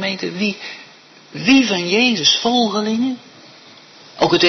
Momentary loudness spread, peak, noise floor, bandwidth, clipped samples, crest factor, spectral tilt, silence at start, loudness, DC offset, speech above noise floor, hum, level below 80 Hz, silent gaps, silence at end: 19 LU; -2 dBFS; -44 dBFS; 6.4 kHz; under 0.1%; 16 dB; -3.5 dB/octave; 0 s; -16 LUFS; under 0.1%; 28 dB; none; -58 dBFS; none; 0 s